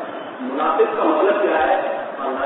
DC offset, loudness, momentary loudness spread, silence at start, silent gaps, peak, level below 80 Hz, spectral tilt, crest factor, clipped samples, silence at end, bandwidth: under 0.1%; -19 LUFS; 10 LU; 0 s; none; -4 dBFS; -58 dBFS; -9 dB/octave; 14 dB; under 0.1%; 0 s; 4.1 kHz